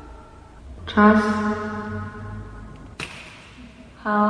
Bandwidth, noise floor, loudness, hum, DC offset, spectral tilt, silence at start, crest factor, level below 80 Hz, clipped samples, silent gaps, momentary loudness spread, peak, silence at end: 10.5 kHz; -44 dBFS; -22 LUFS; none; under 0.1%; -7 dB/octave; 0 s; 22 dB; -44 dBFS; under 0.1%; none; 28 LU; 0 dBFS; 0 s